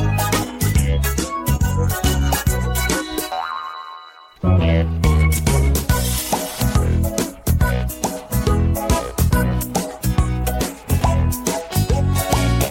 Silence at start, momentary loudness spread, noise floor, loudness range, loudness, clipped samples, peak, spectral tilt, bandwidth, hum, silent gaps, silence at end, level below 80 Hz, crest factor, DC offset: 0 s; 7 LU; -40 dBFS; 2 LU; -19 LUFS; under 0.1%; -2 dBFS; -5 dB/octave; 17 kHz; none; none; 0 s; -24 dBFS; 16 dB; under 0.1%